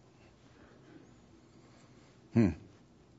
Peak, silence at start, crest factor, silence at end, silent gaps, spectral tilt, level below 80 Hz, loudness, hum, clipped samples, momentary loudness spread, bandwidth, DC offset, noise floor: -14 dBFS; 2.35 s; 24 dB; 0.6 s; none; -9 dB/octave; -60 dBFS; -32 LUFS; none; under 0.1%; 27 LU; 7.6 kHz; under 0.1%; -61 dBFS